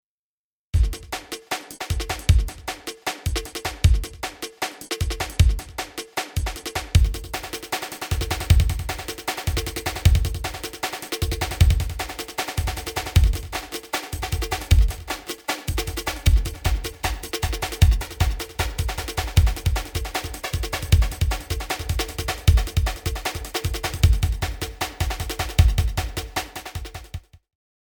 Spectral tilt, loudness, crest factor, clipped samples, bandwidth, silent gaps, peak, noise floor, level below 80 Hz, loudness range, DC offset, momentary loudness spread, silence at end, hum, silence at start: -4.5 dB/octave; -25 LUFS; 20 dB; under 0.1%; over 20 kHz; none; -2 dBFS; under -90 dBFS; -26 dBFS; 1 LU; under 0.1%; 10 LU; 0.75 s; none; 0.75 s